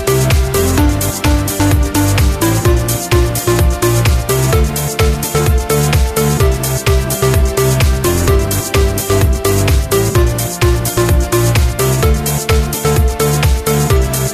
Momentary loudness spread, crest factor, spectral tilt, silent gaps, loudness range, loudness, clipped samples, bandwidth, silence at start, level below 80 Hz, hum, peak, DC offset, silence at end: 2 LU; 10 dB; -5 dB/octave; none; 0 LU; -13 LUFS; under 0.1%; 15.5 kHz; 0 s; -16 dBFS; none; -2 dBFS; under 0.1%; 0 s